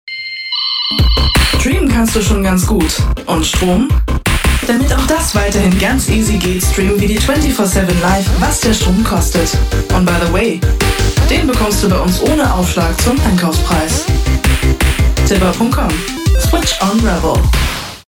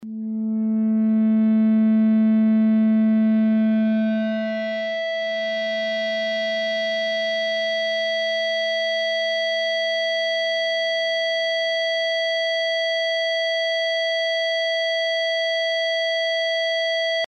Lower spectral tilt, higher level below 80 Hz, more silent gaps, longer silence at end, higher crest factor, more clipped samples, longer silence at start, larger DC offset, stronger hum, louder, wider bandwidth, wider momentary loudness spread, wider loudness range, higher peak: about the same, -4.5 dB/octave vs -5 dB/octave; first, -16 dBFS vs -84 dBFS; neither; first, 0.15 s vs 0 s; about the same, 10 dB vs 8 dB; neither; about the same, 0.05 s vs 0 s; neither; neither; first, -13 LUFS vs -21 LUFS; first, 17.5 kHz vs 9 kHz; second, 3 LU vs 6 LU; second, 1 LU vs 4 LU; first, -2 dBFS vs -14 dBFS